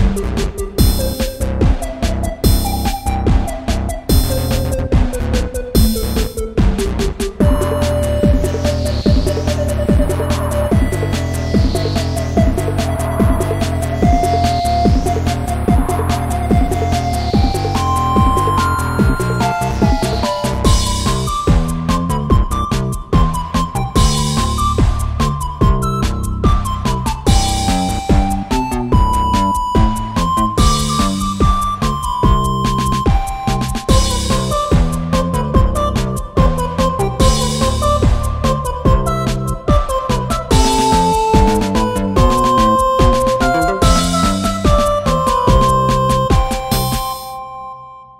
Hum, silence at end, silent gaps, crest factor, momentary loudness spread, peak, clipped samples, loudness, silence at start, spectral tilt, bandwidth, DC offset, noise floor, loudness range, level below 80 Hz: none; 0.15 s; none; 14 dB; 6 LU; 0 dBFS; under 0.1%; -16 LUFS; 0 s; -5.5 dB/octave; 16.5 kHz; under 0.1%; -34 dBFS; 3 LU; -18 dBFS